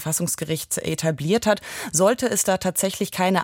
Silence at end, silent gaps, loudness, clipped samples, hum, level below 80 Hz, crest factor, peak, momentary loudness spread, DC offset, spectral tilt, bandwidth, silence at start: 0 s; none; -22 LUFS; under 0.1%; none; -56 dBFS; 16 dB; -6 dBFS; 6 LU; under 0.1%; -4 dB/octave; 17 kHz; 0 s